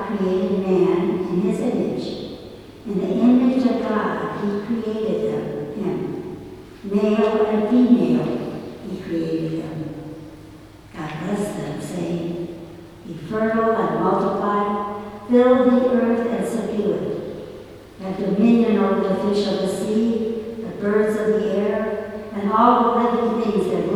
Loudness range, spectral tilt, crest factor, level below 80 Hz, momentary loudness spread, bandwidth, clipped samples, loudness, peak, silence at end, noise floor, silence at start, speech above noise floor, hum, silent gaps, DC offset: 9 LU; -7.5 dB/octave; 20 dB; -52 dBFS; 17 LU; 13 kHz; under 0.1%; -21 LUFS; 0 dBFS; 0 s; -42 dBFS; 0 s; 23 dB; none; none; under 0.1%